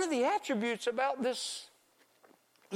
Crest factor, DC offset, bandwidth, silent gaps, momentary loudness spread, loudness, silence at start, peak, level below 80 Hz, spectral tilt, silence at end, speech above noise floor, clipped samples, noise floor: 16 dB; under 0.1%; 16 kHz; none; 7 LU; -33 LUFS; 0 s; -20 dBFS; -86 dBFS; -3 dB/octave; 0 s; 35 dB; under 0.1%; -68 dBFS